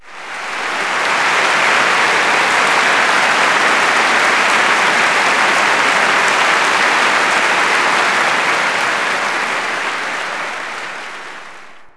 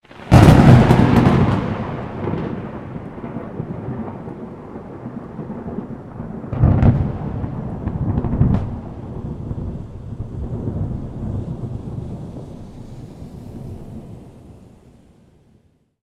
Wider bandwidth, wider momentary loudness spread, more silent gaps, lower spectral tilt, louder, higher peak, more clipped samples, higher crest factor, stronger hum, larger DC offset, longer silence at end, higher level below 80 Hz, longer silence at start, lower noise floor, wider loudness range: second, 11 kHz vs 12.5 kHz; second, 11 LU vs 22 LU; neither; second, -1 dB/octave vs -8 dB/octave; first, -12 LUFS vs -18 LUFS; about the same, 0 dBFS vs 0 dBFS; neither; second, 14 dB vs 20 dB; neither; neither; second, 0.05 s vs 1.4 s; second, -62 dBFS vs -30 dBFS; about the same, 0.05 s vs 0.1 s; second, -38 dBFS vs -57 dBFS; second, 5 LU vs 17 LU